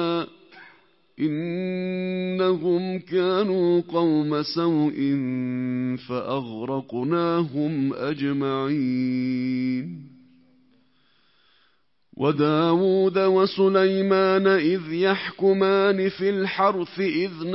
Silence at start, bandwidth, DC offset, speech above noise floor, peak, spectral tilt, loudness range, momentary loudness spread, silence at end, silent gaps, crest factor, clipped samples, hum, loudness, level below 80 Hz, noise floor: 0 s; 5.8 kHz; under 0.1%; 46 dB; -8 dBFS; -10.5 dB/octave; 7 LU; 8 LU; 0 s; none; 16 dB; under 0.1%; none; -23 LUFS; -70 dBFS; -68 dBFS